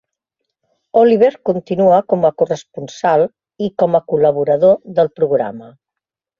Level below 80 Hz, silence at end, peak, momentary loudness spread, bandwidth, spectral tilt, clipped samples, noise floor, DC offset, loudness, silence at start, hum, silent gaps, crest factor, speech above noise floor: -58 dBFS; 0.7 s; -2 dBFS; 11 LU; 7.2 kHz; -7.5 dB/octave; under 0.1%; -83 dBFS; under 0.1%; -15 LUFS; 0.95 s; none; none; 14 dB; 69 dB